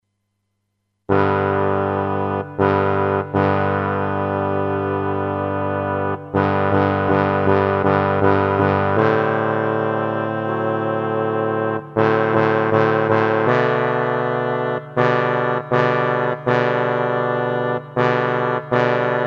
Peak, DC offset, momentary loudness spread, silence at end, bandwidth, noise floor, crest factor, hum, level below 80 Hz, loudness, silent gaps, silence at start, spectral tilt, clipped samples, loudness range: -2 dBFS; under 0.1%; 5 LU; 0 s; 7 kHz; -73 dBFS; 18 dB; none; -58 dBFS; -19 LUFS; none; 1.1 s; -8.5 dB/octave; under 0.1%; 3 LU